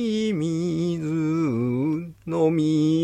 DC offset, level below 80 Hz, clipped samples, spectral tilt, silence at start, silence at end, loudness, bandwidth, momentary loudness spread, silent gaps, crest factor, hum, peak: under 0.1%; -60 dBFS; under 0.1%; -7.5 dB/octave; 0 s; 0 s; -24 LUFS; 9.6 kHz; 5 LU; none; 12 dB; none; -10 dBFS